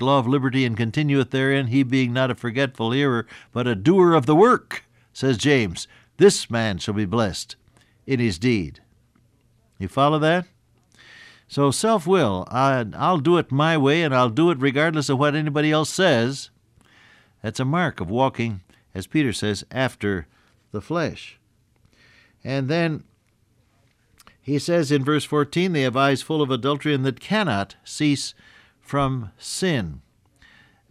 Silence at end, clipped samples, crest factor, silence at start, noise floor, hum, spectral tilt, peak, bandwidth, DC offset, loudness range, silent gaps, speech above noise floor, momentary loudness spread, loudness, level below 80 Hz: 0.9 s; under 0.1%; 18 dB; 0 s; -63 dBFS; none; -5.5 dB/octave; -4 dBFS; 14 kHz; under 0.1%; 7 LU; none; 42 dB; 14 LU; -21 LUFS; -56 dBFS